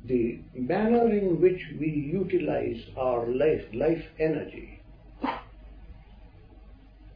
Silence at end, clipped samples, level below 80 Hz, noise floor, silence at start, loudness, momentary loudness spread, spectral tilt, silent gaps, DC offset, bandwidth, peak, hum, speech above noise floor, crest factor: 0 s; under 0.1%; -50 dBFS; -50 dBFS; 0 s; -27 LUFS; 12 LU; -10.5 dB/octave; none; under 0.1%; 5.2 kHz; -10 dBFS; none; 24 dB; 18 dB